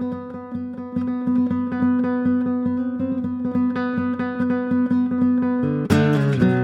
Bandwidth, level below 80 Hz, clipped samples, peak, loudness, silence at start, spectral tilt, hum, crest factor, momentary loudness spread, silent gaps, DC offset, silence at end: 10 kHz; -56 dBFS; under 0.1%; -4 dBFS; -21 LUFS; 0 s; -8.5 dB/octave; none; 16 dB; 10 LU; none; under 0.1%; 0 s